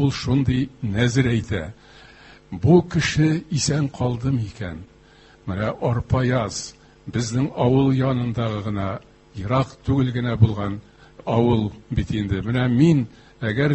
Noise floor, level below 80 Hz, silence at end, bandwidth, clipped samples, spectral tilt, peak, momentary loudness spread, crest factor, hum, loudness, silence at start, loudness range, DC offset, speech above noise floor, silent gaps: -50 dBFS; -40 dBFS; 0 s; 8.6 kHz; under 0.1%; -6.5 dB/octave; -2 dBFS; 15 LU; 20 dB; none; -22 LUFS; 0 s; 3 LU; under 0.1%; 30 dB; none